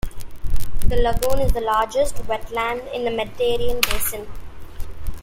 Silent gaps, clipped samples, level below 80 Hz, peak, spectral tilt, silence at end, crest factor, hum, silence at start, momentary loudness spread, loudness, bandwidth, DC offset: none; under 0.1%; -26 dBFS; 0 dBFS; -4 dB/octave; 0 s; 18 dB; none; 0.05 s; 17 LU; -23 LUFS; 16.5 kHz; under 0.1%